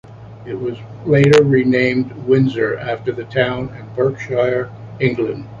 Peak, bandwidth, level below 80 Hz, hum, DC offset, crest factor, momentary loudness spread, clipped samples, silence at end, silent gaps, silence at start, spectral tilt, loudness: 0 dBFS; 10.5 kHz; -48 dBFS; none; under 0.1%; 16 dB; 15 LU; under 0.1%; 0 s; none; 0.05 s; -7.5 dB/octave; -17 LUFS